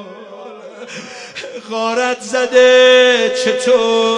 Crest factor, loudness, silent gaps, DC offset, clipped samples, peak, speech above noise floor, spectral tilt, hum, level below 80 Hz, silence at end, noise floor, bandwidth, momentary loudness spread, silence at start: 14 dB; -12 LUFS; none; under 0.1%; under 0.1%; 0 dBFS; 20 dB; -2 dB/octave; none; -66 dBFS; 0 s; -33 dBFS; 10.5 kHz; 25 LU; 0 s